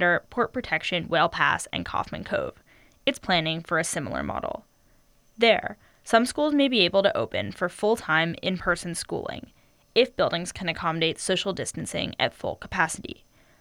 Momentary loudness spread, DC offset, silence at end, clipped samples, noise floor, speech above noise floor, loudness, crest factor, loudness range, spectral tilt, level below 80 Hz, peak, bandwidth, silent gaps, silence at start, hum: 11 LU; under 0.1%; 0.45 s; under 0.1%; -60 dBFS; 35 dB; -25 LUFS; 20 dB; 4 LU; -3.5 dB/octave; -54 dBFS; -6 dBFS; 19 kHz; none; 0 s; none